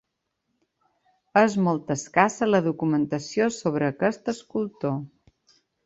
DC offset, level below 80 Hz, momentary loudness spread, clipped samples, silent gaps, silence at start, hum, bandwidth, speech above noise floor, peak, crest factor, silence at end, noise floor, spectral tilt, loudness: under 0.1%; -66 dBFS; 9 LU; under 0.1%; none; 1.35 s; none; 8.2 kHz; 55 dB; -2 dBFS; 24 dB; 0.8 s; -78 dBFS; -6 dB/octave; -24 LUFS